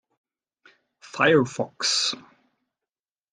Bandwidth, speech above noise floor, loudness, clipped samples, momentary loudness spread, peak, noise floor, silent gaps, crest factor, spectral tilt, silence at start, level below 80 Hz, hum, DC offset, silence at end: 10.5 kHz; over 68 dB; -22 LUFS; under 0.1%; 15 LU; -4 dBFS; under -90 dBFS; none; 22 dB; -3 dB/octave; 1.05 s; -70 dBFS; none; under 0.1%; 1.1 s